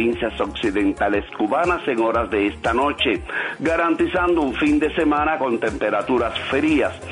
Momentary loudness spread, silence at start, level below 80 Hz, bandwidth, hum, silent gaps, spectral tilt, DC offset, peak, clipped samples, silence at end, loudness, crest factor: 4 LU; 0 s; -40 dBFS; 10.5 kHz; none; none; -5.5 dB/octave; under 0.1%; -8 dBFS; under 0.1%; 0 s; -20 LUFS; 12 dB